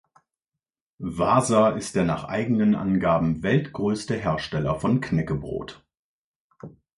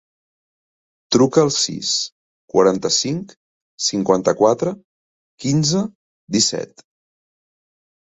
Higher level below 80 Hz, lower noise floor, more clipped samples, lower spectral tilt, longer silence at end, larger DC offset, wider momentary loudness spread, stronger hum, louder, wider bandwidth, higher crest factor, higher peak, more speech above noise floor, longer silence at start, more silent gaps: first, -48 dBFS vs -58 dBFS; about the same, -88 dBFS vs under -90 dBFS; neither; first, -6.5 dB/octave vs -4 dB/octave; second, 0.3 s vs 1.45 s; neither; second, 10 LU vs 13 LU; neither; second, -24 LUFS vs -18 LUFS; first, 11.5 kHz vs 8.2 kHz; about the same, 18 dB vs 20 dB; second, -6 dBFS vs 0 dBFS; second, 65 dB vs over 72 dB; about the same, 1 s vs 1.1 s; second, 5.99-6.50 s vs 2.12-2.48 s, 3.37-3.78 s, 4.84-5.38 s, 5.95-6.27 s